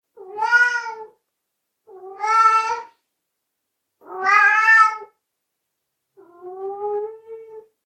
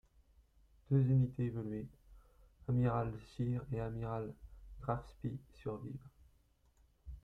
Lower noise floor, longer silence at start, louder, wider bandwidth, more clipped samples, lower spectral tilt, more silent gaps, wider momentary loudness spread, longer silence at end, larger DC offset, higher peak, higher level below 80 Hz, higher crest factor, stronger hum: first, -78 dBFS vs -71 dBFS; second, 0.2 s vs 0.9 s; first, -17 LUFS vs -39 LUFS; first, 11 kHz vs 4.8 kHz; neither; second, 0 dB/octave vs -10.5 dB/octave; neither; first, 25 LU vs 18 LU; first, 0.25 s vs 0.05 s; neither; first, -2 dBFS vs -20 dBFS; second, -80 dBFS vs -58 dBFS; about the same, 20 dB vs 20 dB; neither